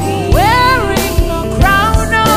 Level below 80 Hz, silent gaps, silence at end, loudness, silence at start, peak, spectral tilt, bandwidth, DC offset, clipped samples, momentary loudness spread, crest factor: -18 dBFS; none; 0 s; -11 LUFS; 0 s; 0 dBFS; -5 dB/octave; 16.5 kHz; under 0.1%; under 0.1%; 6 LU; 10 dB